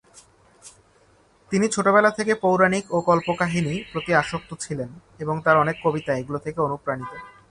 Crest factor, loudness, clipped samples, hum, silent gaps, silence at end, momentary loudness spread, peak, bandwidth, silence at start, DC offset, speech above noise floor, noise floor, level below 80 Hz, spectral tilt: 20 dB; -22 LUFS; under 0.1%; none; none; 0.2 s; 13 LU; -2 dBFS; 11.5 kHz; 0.65 s; under 0.1%; 36 dB; -58 dBFS; -56 dBFS; -5.5 dB/octave